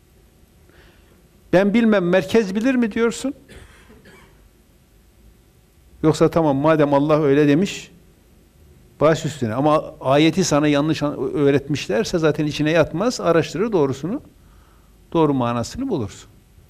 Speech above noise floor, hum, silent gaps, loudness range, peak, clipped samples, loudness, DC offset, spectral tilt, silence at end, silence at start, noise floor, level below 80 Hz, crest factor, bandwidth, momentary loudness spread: 35 dB; none; none; 5 LU; -6 dBFS; under 0.1%; -19 LUFS; under 0.1%; -6 dB/octave; 0.45 s; 1.5 s; -53 dBFS; -48 dBFS; 14 dB; 15 kHz; 9 LU